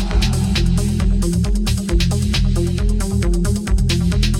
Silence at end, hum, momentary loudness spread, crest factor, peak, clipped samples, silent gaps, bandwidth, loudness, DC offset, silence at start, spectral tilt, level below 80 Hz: 0 s; none; 2 LU; 12 dB; -4 dBFS; under 0.1%; none; 15.5 kHz; -18 LUFS; under 0.1%; 0 s; -5.5 dB/octave; -18 dBFS